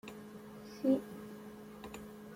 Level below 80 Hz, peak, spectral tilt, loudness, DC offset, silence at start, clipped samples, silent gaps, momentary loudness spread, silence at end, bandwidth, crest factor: -70 dBFS; -20 dBFS; -6.5 dB/octave; -39 LUFS; under 0.1%; 0.05 s; under 0.1%; none; 17 LU; 0 s; 16.5 kHz; 22 dB